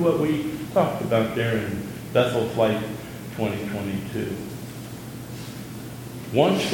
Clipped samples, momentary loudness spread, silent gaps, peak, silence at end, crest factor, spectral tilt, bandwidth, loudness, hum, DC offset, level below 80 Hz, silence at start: under 0.1%; 15 LU; none; -4 dBFS; 0 s; 20 dB; -6 dB/octave; 17.5 kHz; -25 LUFS; none; under 0.1%; -54 dBFS; 0 s